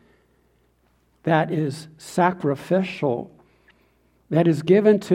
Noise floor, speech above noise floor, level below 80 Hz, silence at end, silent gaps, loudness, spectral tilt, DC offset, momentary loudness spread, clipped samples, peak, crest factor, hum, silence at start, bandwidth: -63 dBFS; 43 dB; -64 dBFS; 0 s; none; -22 LUFS; -7.5 dB/octave; under 0.1%; 14 LU; under 0.1%; -4 dBFS; 18 dB; none; 1.25 s; 14 kHz